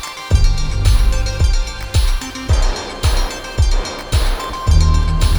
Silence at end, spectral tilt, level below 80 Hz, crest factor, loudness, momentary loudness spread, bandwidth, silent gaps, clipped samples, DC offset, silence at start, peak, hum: 0 s; -4.5 dB/octave; -16 dBFS; 14 dB; -18 LUFS; 6 LU; over 20 kHz; none; under 0.1%; under 0.1%; 0 s; 0 dBFS; none